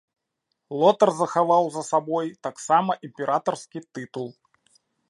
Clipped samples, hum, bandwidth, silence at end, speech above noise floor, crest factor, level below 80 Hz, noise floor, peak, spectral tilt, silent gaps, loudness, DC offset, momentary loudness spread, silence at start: under 0.1%; none; 11.5 kHz; 0.8 s; 56 dB; 20 dB; -80 dBFS; -79 dBFS; -4 dBFS; -5 dB/octave; none; -23 LUFS; under 0.1%; 15 LU; 0.7 s